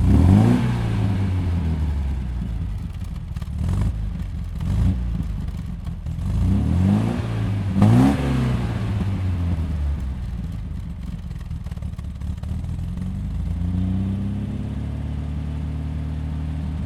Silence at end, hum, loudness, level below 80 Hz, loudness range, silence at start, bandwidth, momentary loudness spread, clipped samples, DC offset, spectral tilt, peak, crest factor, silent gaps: 0 s; none; -24 LUFS; -28 dBFS; 8 LU; 0 s; 12 kHz; 13 LU; under 0.1%; under 0.1%; -8.5 dB/octave; 0 dBFS; 20 dB; none